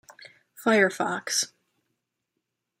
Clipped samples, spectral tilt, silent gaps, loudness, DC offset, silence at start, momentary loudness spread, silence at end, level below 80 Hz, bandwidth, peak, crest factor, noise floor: under 0.1%; -2.5 dB/octave; none; -25 LUFS; under 0.1%; 0.2 s; 8 LU; 1.35 s; -76 dBFS; 16 kHz; -8 dBFS; 22 dB; -82 dBFS